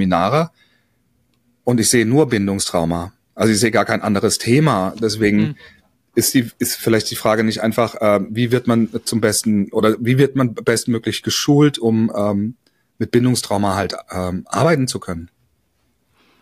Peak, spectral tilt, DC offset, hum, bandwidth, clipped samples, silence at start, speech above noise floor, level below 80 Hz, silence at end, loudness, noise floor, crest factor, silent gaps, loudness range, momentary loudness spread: -2 dBFS; -5 dB/octave; under 0.1%; none; 15.5 kHz; under 0.1%; 0 s; 48 dB; -50 dBFS; 1.15 s; -17 LUFS; -65 dBFS; 16 dB; none; 3 LU; 9 LU